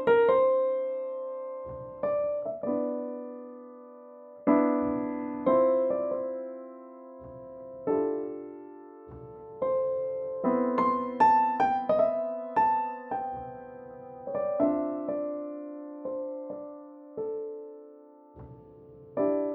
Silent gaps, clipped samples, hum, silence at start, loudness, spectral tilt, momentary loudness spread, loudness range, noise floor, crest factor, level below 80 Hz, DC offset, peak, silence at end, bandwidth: none; under 0.1%; none; 0 s; -29 LUFS; -8.5 dB/octave; 22 LU; 10 LU; -52 dBFS; 20 dB; -64 dBFS; under 0.1%; -10 dBFS; 0 s; 5.8 kHz